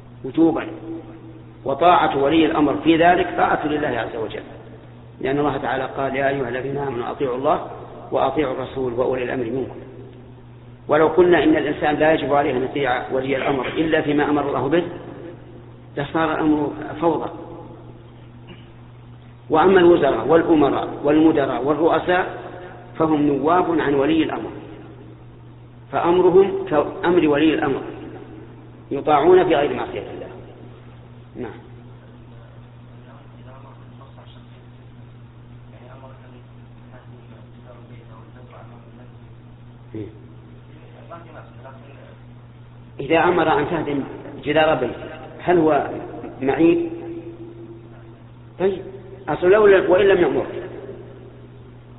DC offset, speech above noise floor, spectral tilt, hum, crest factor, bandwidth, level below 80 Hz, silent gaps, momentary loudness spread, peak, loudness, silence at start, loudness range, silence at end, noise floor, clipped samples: under 0.1%; 24 dB; -4.5 dB/octave; none; 20 dB; 4.1 kHz; -48 dBFS; none; 25 LU; -2 dBFS; -19 LUFS; 0 s; 21 LU; 0 s; -42 dBFS; under 0.1%